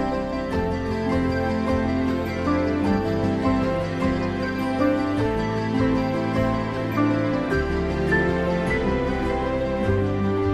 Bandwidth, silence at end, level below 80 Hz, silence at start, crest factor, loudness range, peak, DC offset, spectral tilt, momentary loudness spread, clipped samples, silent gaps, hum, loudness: 13 kHz; 0 s; -36 dBFS; 0 s; 14 dB; 1 LU; -8 dBFS; under 0.1%; -7.5 dB/octave; 3 LU; under 0.1%; none; none; -23 LUFS